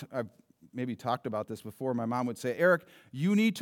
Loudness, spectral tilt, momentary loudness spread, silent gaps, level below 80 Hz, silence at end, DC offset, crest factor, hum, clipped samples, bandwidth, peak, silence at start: -31 LUFS; -6.5 dB/octave; 14 LU; none; -82 dBFS; 0 s; under 0.1%; 18 dB; none; under 0.1%; 17 kHz; -12 dBFS; 0 s